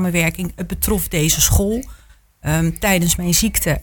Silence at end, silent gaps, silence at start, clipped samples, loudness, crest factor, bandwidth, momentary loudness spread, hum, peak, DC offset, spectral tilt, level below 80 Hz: 0 s; none; 0 s; under 0.1%; -17 LUFS; 16 dB; 19.5 kHz; 11 LU; none; -2 dBFS; under 0.1%; -4 dB/octave; -28 dBFS